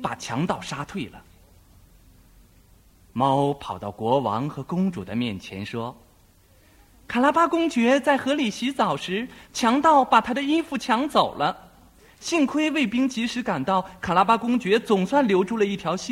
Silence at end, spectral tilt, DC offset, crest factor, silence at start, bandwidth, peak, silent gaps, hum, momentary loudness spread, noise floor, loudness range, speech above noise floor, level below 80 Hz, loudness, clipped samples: 0 s; -5 dB/octave; under 0.1%; 22 dB; 0 s; 16 kHz; -2 dBFS; none; none; 12 LU; -56 dBFS; 7 LU; 33 dB; -56 dBFS; -23 LUFS; under 0.1%